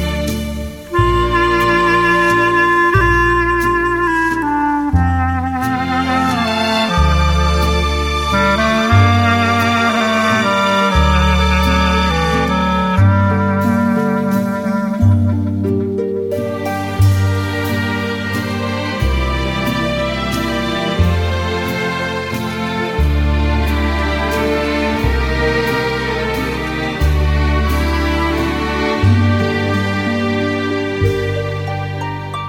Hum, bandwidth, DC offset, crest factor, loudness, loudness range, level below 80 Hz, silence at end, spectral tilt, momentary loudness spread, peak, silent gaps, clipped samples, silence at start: none; 17 kHz; under 0.1%; 14 dB; -15 LUFS; 5 LU; -24 dBFS; 0 s; -6 dB/octave; 7 LU; -2 dBFS; none; under 0.1%; 0 s